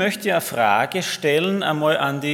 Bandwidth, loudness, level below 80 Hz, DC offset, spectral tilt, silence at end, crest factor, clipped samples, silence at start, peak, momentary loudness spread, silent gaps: 18 kHz; -20 LUFS; -68 dBFS; under 0.1%; -4 dB/octave; 0 s; 18 dB; under 0.1%; 0 s; -2 dBFS; 3 LU; none